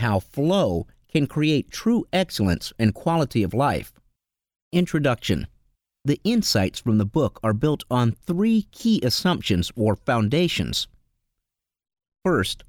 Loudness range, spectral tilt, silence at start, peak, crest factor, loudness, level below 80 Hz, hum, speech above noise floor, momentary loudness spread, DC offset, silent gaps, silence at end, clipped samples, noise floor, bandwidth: 3 LU; -6 dB/octave; 0 s; -6 dBFS; 18 dB; -23 LUFS; -46 dBFS; none; 62 dB; 6 LU; under 0.1%; 4.62-4.71 s; 0.1 s; under 0.1%; -83 dBFS; 19 kHz